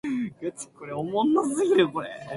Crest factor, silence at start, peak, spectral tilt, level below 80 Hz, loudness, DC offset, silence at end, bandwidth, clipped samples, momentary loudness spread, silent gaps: 18 dB; 0.05 s; -8 dBFS; -5 dB/octave; -66 dBFS; -25 LUFS; under 0.1%; 0 s; 11.5 kHz; under 0.1%; 13 LU; none